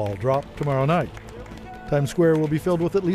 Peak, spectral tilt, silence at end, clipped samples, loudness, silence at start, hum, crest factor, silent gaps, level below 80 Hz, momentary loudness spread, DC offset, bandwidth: -6 dBFS; -7.5 dB/octave; 0 s; under 0.1%; -22 LUFS; 0 s; none; 16 dB; none; -46 dBFS; 19 LU; under 0.1%; 14.5 kHz